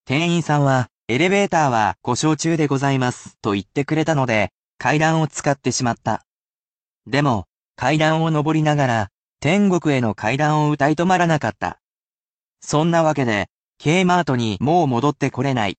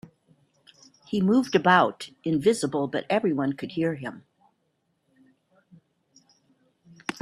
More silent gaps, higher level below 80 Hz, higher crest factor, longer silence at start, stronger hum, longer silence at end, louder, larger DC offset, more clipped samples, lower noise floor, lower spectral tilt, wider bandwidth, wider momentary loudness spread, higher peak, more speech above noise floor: first, 0.91-1.06 s, 4.51-4.78 s, 6.27-7.01 s, 7.52-7.74 s, 9.14-9.36 s, 11.83-12.53 s, 13.52-13.73 s vs none; first, -54 dBFS vs -68 dBFS; second, 16 dB vs 22 dB; second, 0.1 s vs 1.1 s; neither; about the same, 0.05 s vs 0.1 s; first, -19 LUFS vs -25 LUFS; neither; neither; first, under -90 dBFS vs -73 dBFS; about the same, -5.5 dB/octave vs -5.5 dB/octave; second, 9 kHz vs 13 kHz; second, 8 LU vs 15 LU; about the same, -2 dBFS vs -4 dBFS; first, over 72 dB vs 50 dB